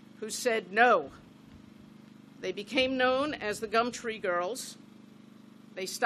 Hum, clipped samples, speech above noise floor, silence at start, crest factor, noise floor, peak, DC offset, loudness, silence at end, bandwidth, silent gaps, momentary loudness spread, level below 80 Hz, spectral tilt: 50 Hz at -60 dBFS; under 0.1%; 24 dB; 0.2 s; 24 dB; -53 dBFS; -8 dBFS; under 0.1%; -29 LUFS; 0 s; 14 kHz; none; 16 LU; -68 dBFS; -2.5 dB/octave